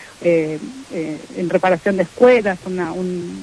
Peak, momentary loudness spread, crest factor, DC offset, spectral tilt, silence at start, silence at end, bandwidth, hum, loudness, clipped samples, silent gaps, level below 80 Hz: -2 dBFS; 14 LU; 16 dB; under 0.1%; -6.5 dB/octave; 0 s; 0 s; 11 kHz; none; -18 LUFS; under 0.1%; none; -54 dBFS